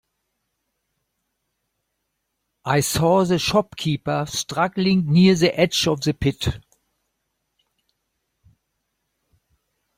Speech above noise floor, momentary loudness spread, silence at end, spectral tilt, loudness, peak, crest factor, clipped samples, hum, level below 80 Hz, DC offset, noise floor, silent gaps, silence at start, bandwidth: 57 dB; 10 LU; 3.4 s; -5 dB/octave; -20 LUFS; -4 dBFS; 20 dB; under 0.1%; none; -48 dBFS; under 0.1%; -76 dBFS; none; 2.65 s; 16.5 kHz